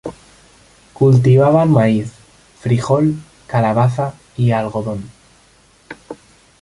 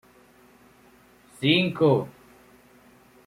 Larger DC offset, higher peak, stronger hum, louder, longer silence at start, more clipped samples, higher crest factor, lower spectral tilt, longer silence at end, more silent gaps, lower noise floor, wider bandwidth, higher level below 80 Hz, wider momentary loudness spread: neither; first, -2 dBFS vs -8 dBFS; neither; first, -15 LUFS vs -22 LUFS; second, 0.05 s vs 1.4 s; neither; second, 14 dB vs 20 dB; first, -8.5 dB/octave vs -6.5 dB/octave; second, 0.5 s vs 1.15 s; neither; second, -51 dBFS vs -56 dBFS; second, 11 kHz vs 15.5 kHz; first, -48 dBFS vs -64 dBFS; first, 21 LU vs 8 LU